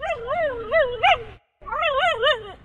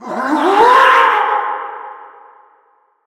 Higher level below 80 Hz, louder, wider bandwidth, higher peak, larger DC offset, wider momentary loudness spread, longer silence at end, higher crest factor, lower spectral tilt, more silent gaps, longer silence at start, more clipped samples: first, -46 dBFS vs -62 dBFS; second, -21 LUFS vs -11 LUFS; second, 10.5 kHz vs 17.5 kHz; second, -6 dBFS vs 0 dBFS; neither; second, 6 LU vs 21 LU; second, 0.1 s vs 1 s; about the same, 16 dB vs 14 dB; about the same, -3 dB/octave vs -3 dB/octave; neither; about the same, 0 s vs 0 s; neither